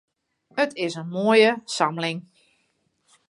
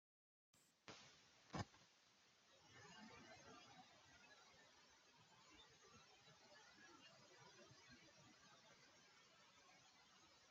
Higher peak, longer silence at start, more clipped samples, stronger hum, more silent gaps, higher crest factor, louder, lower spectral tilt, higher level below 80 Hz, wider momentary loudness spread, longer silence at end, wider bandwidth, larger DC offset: first, -4 dBFS vs -36 dBFS; about the same, 0.55 s vs 0.55 s; neither; neither; neither; second, 20 dB vs 30 dB; first, -22 LUFS vs -64 LUFS; about the same, -4.5 dB/octave vs -3.5 dB/octave; first, -78 dBFS vs -86 dBFS; about the same, 12 LU vs 11 LU; first, 1.1 s vs 0 s; first, 11.5 kHz vs 7.4 kHz; neither